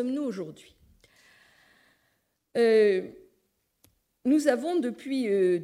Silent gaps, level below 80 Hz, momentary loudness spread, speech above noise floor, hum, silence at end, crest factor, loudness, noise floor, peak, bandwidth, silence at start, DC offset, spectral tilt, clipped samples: none; -72 dBFS; 14 LU; 49 dB; none; 0 s; 20 dB; -26 LUFS; -74 dBFS; -8 dBFS; 14 kHz; 0 s; under 0.1%; -5.5 dB/octave; under 0.1%